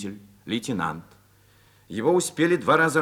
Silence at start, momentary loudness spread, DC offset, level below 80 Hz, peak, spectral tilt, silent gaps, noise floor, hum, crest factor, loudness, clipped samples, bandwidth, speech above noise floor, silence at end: 0 s; 18 LU; under 0.1%; -64 dBFS; -6 dBFS; -4.5 dB/octave; none; -57 dBFS; none; 20 dB; -24 LUFS; under 0.1%; 17 kHz; 34 dB; 0 s